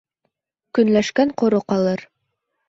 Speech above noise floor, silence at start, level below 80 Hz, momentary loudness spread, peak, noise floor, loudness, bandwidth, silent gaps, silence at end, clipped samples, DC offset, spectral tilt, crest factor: 57 dB; 0.75 s; -60 dBFS; 7 LU; -4 dBFS; -75 dBFS; -19 LUFS; 7.8 kHz; none; 0.65 s; under 0.1%; under 0.1%; -6 dB/octave; 16 dB